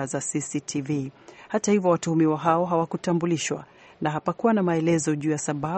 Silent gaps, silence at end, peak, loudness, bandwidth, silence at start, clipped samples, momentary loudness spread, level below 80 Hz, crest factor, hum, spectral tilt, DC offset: none; 0 s; -6 dBFS; -25 LUFS; 8.8 kHz; 0 s; under 0.1%; 8 LU; -64 dBFS; 18 dB; none; -5.5 dB/octave; under 0.1%